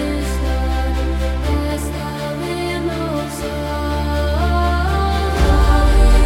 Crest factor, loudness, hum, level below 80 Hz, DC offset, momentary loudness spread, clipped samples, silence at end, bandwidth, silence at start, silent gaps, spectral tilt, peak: 16 dB; -19 LUFS; none; -18 dBFS; under 0.1%; 9 LU; under 0.1%; 0 s; 15.5 kHz; 0 s; none; -6 dB/octave; 0 dBFS